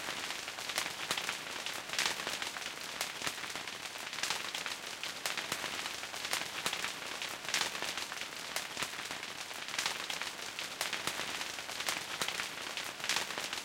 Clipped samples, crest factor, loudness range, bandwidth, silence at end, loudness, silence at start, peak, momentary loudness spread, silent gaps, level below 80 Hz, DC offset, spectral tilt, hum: under 0.1%; 26 dB; 1 LU; 17 kHz; 0 s; -37 LUFS; 0 s; -12 dBFS; 6 LU; none; -72 dBFS; under 0.1%; 0 dB/octave; none